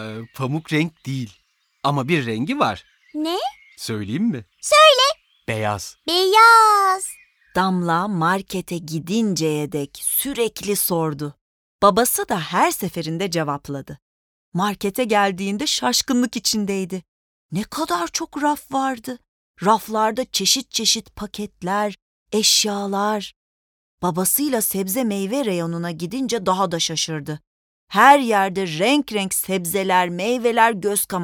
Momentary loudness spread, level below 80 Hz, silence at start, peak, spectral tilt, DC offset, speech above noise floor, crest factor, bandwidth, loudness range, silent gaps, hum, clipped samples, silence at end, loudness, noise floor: 14 LU; -56 dBFS; 0 s; 0 dBFS; -3.5 dB/octave; under 0.1%; over 70 dB; 20 dB; over 20 kHz; 7 LU; 11.41-11.79 s, 14.02-14.52 s, 17.08-17.49 s, 19.28-19.54 s, 22.02-22.26 s, 23.36-23.98 s, 27.47-27.87 s; none; under 0.1%; 0 s; -19 LUFS; under -90 dBFS